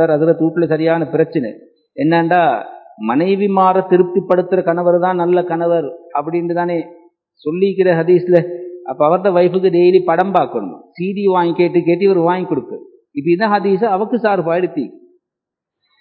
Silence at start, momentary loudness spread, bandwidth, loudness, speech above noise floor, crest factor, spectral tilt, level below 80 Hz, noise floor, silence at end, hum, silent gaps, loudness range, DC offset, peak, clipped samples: 0 s; 13 LU; 4.7 kHz; -15 LUFS; 68 dB; 14 dB; -10.5 dB/octave; -68 dBFS; -82 dBFS; 1.05 s; none; none; 3 LU; under 0.1%; 0 dBFS; under 0.1%